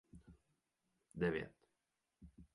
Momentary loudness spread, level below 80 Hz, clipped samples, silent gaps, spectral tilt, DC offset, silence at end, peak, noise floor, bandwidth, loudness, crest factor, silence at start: 24 LU; -68 dBFS; under 0.1%; none; -7.5 dB/octave; under 0.1%; 0.1 s; -26 dBFS; -88 dBFS; 11 kHz; -42 LUFS; 22 dB; 0.15 s